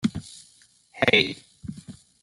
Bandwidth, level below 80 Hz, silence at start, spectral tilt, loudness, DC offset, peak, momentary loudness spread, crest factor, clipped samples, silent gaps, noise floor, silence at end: 15.5 kHz; -56 dBFS; 0.05 s; -4.5 dB/octave; -22 LUFS; under 0.1%; -4 dBFS; 24 LU; 24 dB; under 0.1%; none; -58 dBFS; 0.3 s